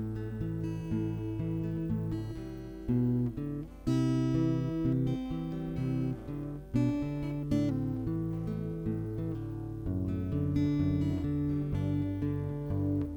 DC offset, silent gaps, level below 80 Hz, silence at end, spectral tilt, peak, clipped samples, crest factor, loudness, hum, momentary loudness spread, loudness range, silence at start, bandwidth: under 0.1%; none; -48 dBFS; 0 s; -9 dB/octave; -16 dBFS; under 0.1%; 16 dB; -33 LUFS; none; 8 LU; 2 LU; 0 s; 19 kHz